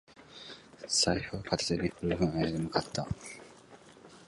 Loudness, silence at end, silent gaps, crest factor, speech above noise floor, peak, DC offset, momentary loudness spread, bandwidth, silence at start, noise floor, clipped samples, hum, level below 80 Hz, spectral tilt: -32 LUFS; 0.05 s; none; 22 dB; 23 dB; -12 dBFS; under 0.1%; 20 LU; 11.5 kHz; 0.1 s; -55 dBFS; under 0.1%; none; -52 dBFS; -4 dB/octave